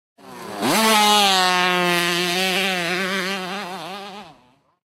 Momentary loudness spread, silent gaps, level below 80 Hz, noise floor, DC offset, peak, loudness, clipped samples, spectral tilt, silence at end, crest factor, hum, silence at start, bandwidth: 19 LU; none; -66 dBFS; -56 dBFS; under 0.1%; -2 dBFS; -18 LUFS; under 0.1%; -2.5 dB/octave; 0.65 s; 18 dB; none; 0.25 s; 16 kHz